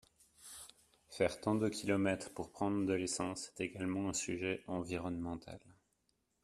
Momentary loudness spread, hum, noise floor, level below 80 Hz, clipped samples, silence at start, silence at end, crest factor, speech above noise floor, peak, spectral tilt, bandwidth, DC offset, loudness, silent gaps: 18 LU; none; -81 dBFS; -68 dBFS; under 0.1%; 0.4 s; 0.7 s; 20 dB; 43 dB; -20 dBFS; -4.5 dB/octave; 14 kHz; under 0.1%; -38 LUFS; none